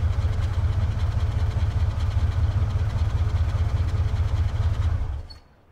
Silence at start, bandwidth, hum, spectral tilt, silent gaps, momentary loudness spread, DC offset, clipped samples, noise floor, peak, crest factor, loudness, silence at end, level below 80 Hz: 0 s; 8 kHz; none; -7.5 dB/octave; none; 2 LU; under 0.1%; under 0.1%; -43 dBFS; -12 dBFS; 10 dB; -25 LUFS; 0.35 s; -28 dBFS